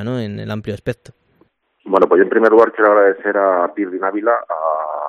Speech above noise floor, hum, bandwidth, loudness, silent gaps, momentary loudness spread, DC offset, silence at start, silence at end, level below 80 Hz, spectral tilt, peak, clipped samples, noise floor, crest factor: 43 dB; none; 7 kHz; -15 LUFS; none; 14 LU; under 0.1%; 0 s; 0 s; -54 dBFS; -8 dB/octave; 0 dBFS; under 0.1%; -58 dBFS; 16 dB